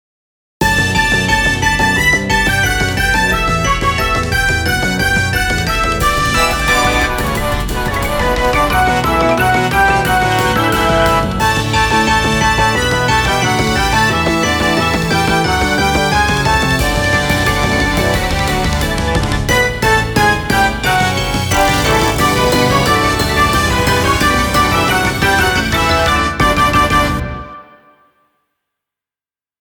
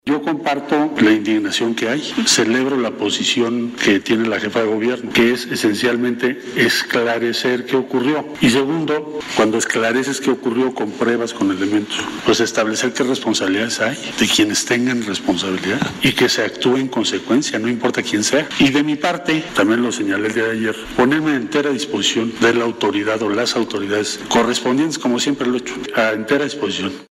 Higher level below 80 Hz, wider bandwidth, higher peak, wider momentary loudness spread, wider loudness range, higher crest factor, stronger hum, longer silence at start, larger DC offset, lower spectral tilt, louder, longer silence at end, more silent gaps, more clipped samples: first, -24 dBFS vs -52 dBFS; first, over 20 kHz vs 16 kHz; about the same, 0 dBFS vs -2 dBFS; about the same, 3 LU vs 5 LU; about the same, 2 LU vs 2 LU; about the same, 14 dB vs 14 dB; neither; first, 0.6 s vs 0.05 s; neither; about the same, -4 dB/octave vs -3.5 dB/octave; first, -13 LUFS vs -17 LUFS; first, 2.05 s vs 0.1 s; neither; neither